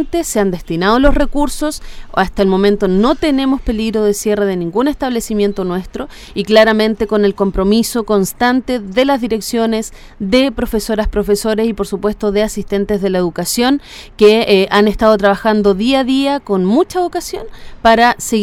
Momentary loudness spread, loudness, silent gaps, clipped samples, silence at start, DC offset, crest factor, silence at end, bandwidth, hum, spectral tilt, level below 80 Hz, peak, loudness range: 9 LU; -14 LUFS; none; under 0.1%; 0 s; under 0.1%; 14 dB; 0 s; 16.5 kHz; none; -5 dB/octave; -28 dBFS; 0 dBFS; 4 LU